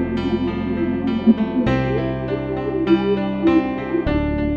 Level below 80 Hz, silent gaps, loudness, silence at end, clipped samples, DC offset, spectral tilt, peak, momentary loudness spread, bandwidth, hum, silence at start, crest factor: -34 dBFS; none; -20 LUFS; 0 s; under 0.1%; under 0.1%; -9 dB/octave; -2 dBFS; 6 LU; 6.8 kHz; none; 0 s; 16 dB